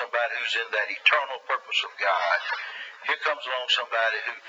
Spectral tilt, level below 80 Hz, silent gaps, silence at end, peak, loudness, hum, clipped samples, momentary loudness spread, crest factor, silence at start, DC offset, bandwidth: 2.5 dB/octave; under -90 dBFS; none; 0 s; -6 dBFS; -25 LUFS; none; under 0.1%; 9 LU; 22 dB; 0 s; under 0.1%; 8 kHz